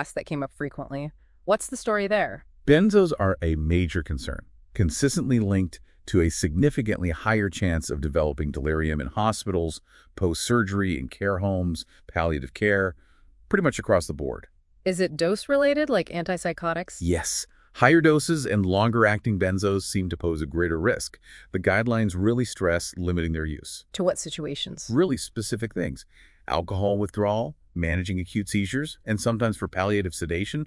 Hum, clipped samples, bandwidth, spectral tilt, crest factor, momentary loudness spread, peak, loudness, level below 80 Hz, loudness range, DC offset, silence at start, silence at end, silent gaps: none; under 0.1%; 12 kHz; -5.5 dB/octave; 22 dB; 11 LU; -2 dBFS; -25 LUFS; -42 dBFS; 5 LU; under 0.1%; 0 s; 0 s; none